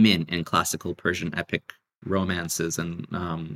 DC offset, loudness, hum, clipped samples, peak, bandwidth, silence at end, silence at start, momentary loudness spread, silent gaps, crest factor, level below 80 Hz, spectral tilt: under 0.1%; -27 LUFS; none; under 0.1%; -6 dBFS; 16 kHz; 0 s; 0 s; 7 LU; none; 20 dB; -54 dBFS; -4 dB/octave